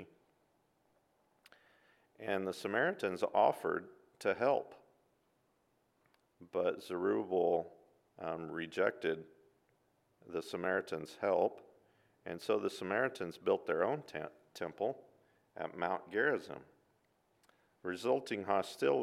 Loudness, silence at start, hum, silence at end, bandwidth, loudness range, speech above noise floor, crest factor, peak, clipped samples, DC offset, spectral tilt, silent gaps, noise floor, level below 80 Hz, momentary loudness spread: -37 LUFS; 0 s; none; 0 s; 15 kHz; 4 LU; 41 dB; 22 dB; -16 dBFS; under 0.1%; under 0.1%; -5.5 dB/octave; none; -77 dBFS; -82 dBFS; 13 LU